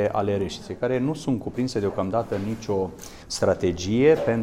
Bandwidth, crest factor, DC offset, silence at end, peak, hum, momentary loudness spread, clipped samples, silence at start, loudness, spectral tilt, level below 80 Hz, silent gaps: 16 kHz; 18 dB; under 0.1%; 0 s; -6 dBFS; none; 10 LU; under 0.1%; 0 s; -25 LUFS; -6 dB/octave; -50 dBFS; none